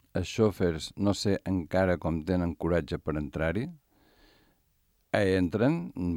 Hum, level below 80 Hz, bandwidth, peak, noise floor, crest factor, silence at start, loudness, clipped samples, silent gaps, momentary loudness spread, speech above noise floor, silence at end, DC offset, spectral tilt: none; -52 dBFS; 16.5 kHz; -12 dBFS; -71 dBFS; 18 dB; 0.15 s; -29 LUFS; under 0.1%; none; 7 LU; 42 dB; 0 s; under 0.1%; -6.5 dB/octave